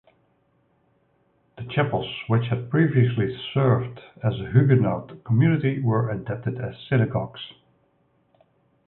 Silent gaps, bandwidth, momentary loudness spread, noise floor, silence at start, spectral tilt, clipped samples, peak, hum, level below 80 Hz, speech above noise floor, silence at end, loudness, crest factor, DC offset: none; 4.1 kHz; 12 LU; -66 dBFS; 1.6 s; -12 dB/octave; under 0.1%; -4 dBFS; none; -54 dBFS; 43 dB; 1.4 s; -23 LUFS; 20 dB; under 0.1%